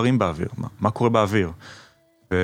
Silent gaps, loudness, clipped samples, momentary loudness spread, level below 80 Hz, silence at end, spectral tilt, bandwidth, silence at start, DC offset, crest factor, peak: none; -23 LUFS; under 0.1%; 14 LU; -48 dBFS; 0 s; -7 dB/octave; 15.5 kHz; 0 s; under 0.1%; 18 dB; -4 dBFS